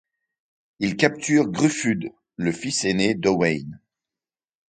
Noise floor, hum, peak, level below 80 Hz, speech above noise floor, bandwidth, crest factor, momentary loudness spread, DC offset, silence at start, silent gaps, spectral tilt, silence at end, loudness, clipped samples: under -90 dBFS; none; 0 dBFS; -58 dBFS; over 68 dB; 9.4 kHz; 24 dB; 9 LU; under 0.1%; 0.8 s; none; -4.5 dB/octave; 0.95 s; -22 LUFS; under 0.1%